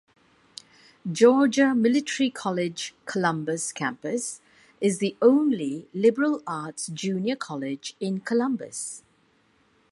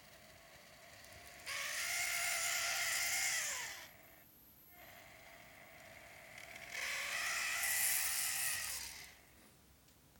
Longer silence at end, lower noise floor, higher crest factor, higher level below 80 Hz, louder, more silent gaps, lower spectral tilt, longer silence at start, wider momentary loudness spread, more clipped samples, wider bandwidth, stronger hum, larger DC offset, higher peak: first, 0.9 s vs 0 s; about the same, -64 dBFS vs -66 dBFS; about the same, 20 dB vs 22 dB; about the same, -74 dBFS vs -72 dBFS; first, -25 LUFS vs -36 LUFS; neither; first, -4.5 dB/octave vs 1.5 dB/octave; first, 1.05 s vs 0 s; second, 14 LU vs 23 LU; neither; second, 11.5 kHz vs over 20 kHz; neither; neither; first, -6 dBFS vs -20 dBFS